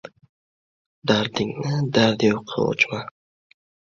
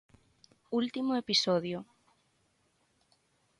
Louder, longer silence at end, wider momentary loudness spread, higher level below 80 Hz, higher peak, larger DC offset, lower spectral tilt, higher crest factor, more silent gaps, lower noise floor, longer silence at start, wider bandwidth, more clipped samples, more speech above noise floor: first, -22 LUFS vs -31 LUFS; second, 0.9 s vs 1.75 s; about the same, 10 LU vs 11 LU; first, -58 dBFS vs -74 dBFS; first, -2 dBFS vs -14 dBFS; neither; first, -5.5 dB/octave vs -4 dB/octave; about the same, 22 dB vs 22 dB; first, 0.29-1.02 s vs none; first, under -90 dBFS vs -73 dBFS; second, 0.05 s vs 0.7 s; second, 7.4 kHz vs 11.5 kHz; neither; first, over 69 dB vs 42 dB